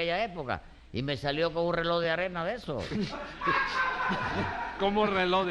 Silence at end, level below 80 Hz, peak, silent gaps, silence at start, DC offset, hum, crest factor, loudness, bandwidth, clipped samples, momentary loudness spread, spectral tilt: 0 s; -50 dBFS; -14 dBFS; none; 0 s; under 0.1%; none; 16 dB; -30 LUFS; 11.5 kHz; under 0.1%; 9 LU; -6 dB/octave